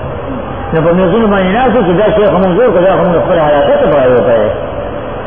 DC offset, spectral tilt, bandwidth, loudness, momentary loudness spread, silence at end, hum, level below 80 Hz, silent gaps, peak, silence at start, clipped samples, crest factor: 3%; -11 dB/octave; 3.6 kHz; -10 LUFS; 11 LU; 0 s; none; -30 dBFS; none; 0 dBFS; 0 s; under 0.1%; 10 dB